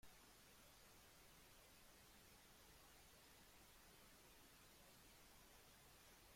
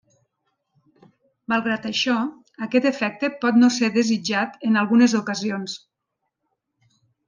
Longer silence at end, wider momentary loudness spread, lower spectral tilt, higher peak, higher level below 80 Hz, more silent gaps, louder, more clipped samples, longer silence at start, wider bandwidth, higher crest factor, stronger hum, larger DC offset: second, 0 s vs 1.5 s; second, 0 LU vs 13 LU; second, -2.5 dB/octave vs -4 dB/octave; second, -52 dBFS vs -6 dBFS; second, -78 dBFS vs -72 dBFS; neither; second, -67 LUFS vs -21 LUFS; neither; second, 0 s vs 1.5 s; first, 16.5 kHz vs 9.6 kHz; about the same, 16 dB vs 16 dB; neither; neither